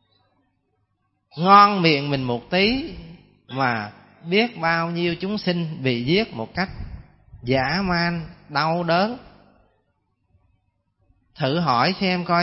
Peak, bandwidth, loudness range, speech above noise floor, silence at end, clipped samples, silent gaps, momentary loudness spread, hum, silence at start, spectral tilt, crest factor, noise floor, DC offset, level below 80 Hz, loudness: 0 dBFS; 6 kHz; 7 LU; 50 dB; 0 s; under 0.1%; none; 18 LU; none; 1.35 s; -9 dB/octave; 22 dB; -71 dBFS; under 0.1%; -48 dBFS; -21 LUFS